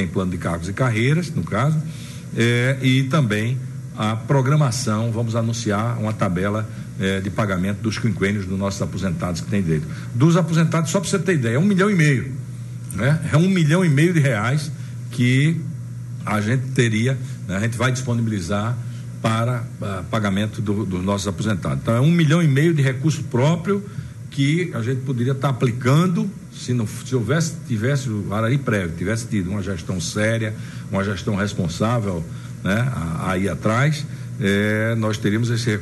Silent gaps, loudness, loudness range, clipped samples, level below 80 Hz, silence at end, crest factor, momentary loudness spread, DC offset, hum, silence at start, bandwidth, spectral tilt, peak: none; -21 LUFS; 4 LU; under 0.1%; -48 dBFS; 0 s; 16 dB; 10 LU; under 0.1%; none; 0 s; 12.5 kHz; -6 dB/octave; -4 dBFS